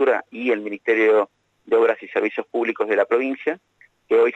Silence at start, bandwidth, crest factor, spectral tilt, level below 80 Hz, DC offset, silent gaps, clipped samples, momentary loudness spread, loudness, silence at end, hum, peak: 0 s; 6 kHz; 14 dB; -5.5 dB/octave; -78 dBFS; under 0.1%; none; under 0.1%; 8 LU; -21 LUFS; 0 s; 50 Hz at -75 dBFS; -6 dBFS